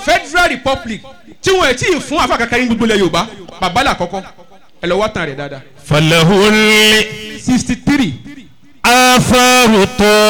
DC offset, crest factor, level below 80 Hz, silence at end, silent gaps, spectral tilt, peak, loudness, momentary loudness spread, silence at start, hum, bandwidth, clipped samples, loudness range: 1%; 10 dB; -34 dBFS; 0 s; none; -3.5 dB/octave; -2 dBFS; -11 LUFS; 15 LU; 0 s; none; 19.5 kHz; under 0.1%; 5 LU